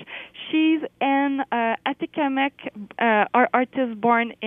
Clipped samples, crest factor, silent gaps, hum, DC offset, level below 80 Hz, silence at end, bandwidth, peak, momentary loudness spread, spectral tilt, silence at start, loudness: under 0.1%; 18 dB; none; none; under 0.1%; -70 dBFS; 0 s; 3.8 kHz; -4 dBFS; 8 LU; -7.5 dB/octave; 0 s; -22 LUFS